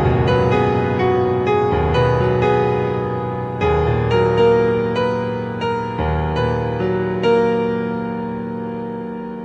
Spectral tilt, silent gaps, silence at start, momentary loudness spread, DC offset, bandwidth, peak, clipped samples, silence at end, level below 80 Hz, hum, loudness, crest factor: -8 dB/octave; none; 0 s; 9 LU; under 0.1%; 7.6 kHz; -4 dBFS; under 0.1%; 0 s; -34 dBFS; none; -18 LUFS; 14 dB